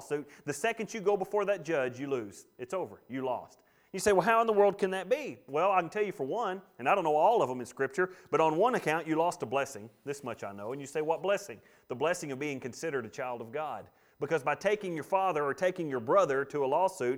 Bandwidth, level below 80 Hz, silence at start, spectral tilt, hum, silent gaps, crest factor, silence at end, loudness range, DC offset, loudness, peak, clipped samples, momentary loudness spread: 16.5 kHz; -70 dBFS; 0 s; -5 dB/octave; none; none; 20 dB; 0 s; 6 LU; under 0.1%; -31 LUFS; -12 dBFS; under 0.1%; 13 LU